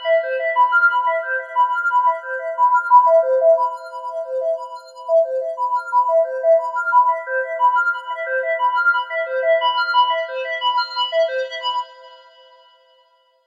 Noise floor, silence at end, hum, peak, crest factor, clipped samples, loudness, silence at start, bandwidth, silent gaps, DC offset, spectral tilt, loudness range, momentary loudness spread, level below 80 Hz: -58 dBFS; 1.3 s; none; -2 dBFS; 16 dB; under 0.1%; -18 LUFS; 0 s; 7.4 kHz; none; under 0.1%; 1.5 dB/octave; 4 LU; 10 LU; under -90 dBFS